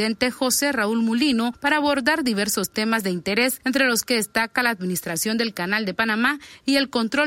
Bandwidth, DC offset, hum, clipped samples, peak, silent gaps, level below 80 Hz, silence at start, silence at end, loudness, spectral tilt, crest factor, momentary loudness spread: 16.5 kHz; under 0.1%; none; under 0.1%; -6 dBFS; none; -58 dBFS; 0 s; 0 s; -21 LUFS; -3 dB/octave; 16 dB; 4 LU